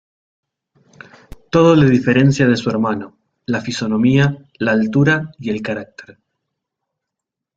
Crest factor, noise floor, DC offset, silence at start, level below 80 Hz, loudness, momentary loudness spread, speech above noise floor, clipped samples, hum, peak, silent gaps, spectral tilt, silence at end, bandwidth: 16 dB; -82 dBFS; under 0.1%; 1.55 s; -50 dBFS; -16 LUFS; 13 LU; 67 dB; under 0.1%; none; 0 dBFS; none; -7 dB/octave; 1.55 s; 7.8 kHz